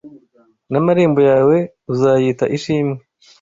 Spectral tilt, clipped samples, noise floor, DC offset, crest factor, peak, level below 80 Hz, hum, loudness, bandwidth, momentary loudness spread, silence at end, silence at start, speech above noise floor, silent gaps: -7.5 dB/octave; under 0.1%; -55 dBFS; under 0.1%; 14 dB; -2 dBFS; -54 dBFS; none; -15 LUFS; 7.6 kHz; 10 LU; 0.45 s; 0.05 s; 41 dB; none